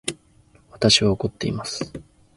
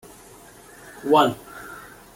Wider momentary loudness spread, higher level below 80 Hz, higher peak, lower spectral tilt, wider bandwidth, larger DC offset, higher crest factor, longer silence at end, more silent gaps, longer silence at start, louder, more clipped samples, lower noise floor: second, 16 LU vs 25 LU; first, -46 dBFS vs -60 dBFS; about the same, -4 dBFS vs -4 dBFS; about the same, -4 dB/octave vs -5 dB/octave; second, 11.5 kHz vs 17 kHz; neither; about the same, 22 dB vs 22 dB; about the same, 0.35 s vs 0.35 s; neither; second, 0.05 s vs 1.05 s; about the same, -21 LUFS vs -20 LUFS; neither; first, -56 dBFS vs -47 dBFS